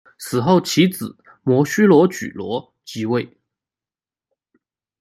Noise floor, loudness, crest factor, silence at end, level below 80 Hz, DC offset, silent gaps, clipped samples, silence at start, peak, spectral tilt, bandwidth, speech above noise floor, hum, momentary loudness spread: under -90 dBFS; -18 LUFS; 18 dB; 1.75 s; -62 dBFS; under 0.1%; none; under 0.1%; 0.2 s; -2 dBFS; -6 dB/octave; 15 kHz; over 73 dB; none; 17 LU